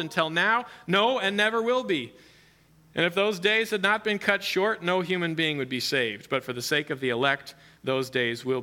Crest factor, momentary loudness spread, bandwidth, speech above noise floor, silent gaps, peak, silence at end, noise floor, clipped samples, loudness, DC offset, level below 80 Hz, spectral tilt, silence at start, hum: 20 dB; 7 LU; 17.5 kHz; 32 dB; none; -6 dBFS; 0 s; -58 dBFS; under 0.1%; -25 LUFS; under 0.1%; -70 dBFS; -4 dB/octave; 0 s; none